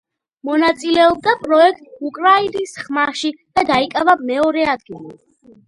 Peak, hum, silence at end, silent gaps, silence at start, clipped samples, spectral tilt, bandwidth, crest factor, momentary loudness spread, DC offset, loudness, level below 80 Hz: 0 dBFS; none; 0.55 s; none; 0.45 s; under 0.1%; -4 dB/octave; 11.5 kHz; 16 dB; 13 LU; under 0.1%; -16 LUFS; -54 dBFS